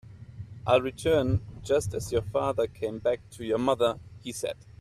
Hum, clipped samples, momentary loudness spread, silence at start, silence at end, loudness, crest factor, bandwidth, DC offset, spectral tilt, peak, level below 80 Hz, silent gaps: none; under 0.1%; 13 LU; 0.05 s; 0.25 s; -28 LUFS; 20 dB; 14.5 kHz; under 0.1%; -5.5 dB/octave; -8 dBFS; -50 dBFS; none